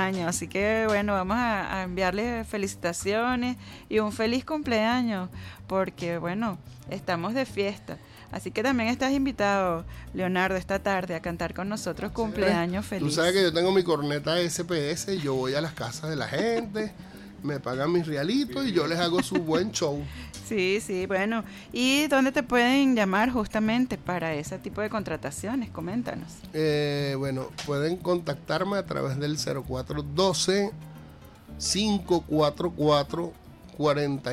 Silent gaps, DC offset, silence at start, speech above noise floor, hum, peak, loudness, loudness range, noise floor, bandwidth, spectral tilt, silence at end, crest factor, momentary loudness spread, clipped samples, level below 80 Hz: none; under 0.1%; 0 s; 21 dB; none; -10 dBFS; -27 LUFS; 5 LU; -47 dBFS; 16 kHz; -4.5 dB/octave; 0 s; 18 dB; 10 LU; under 0.1%; -50 dBFS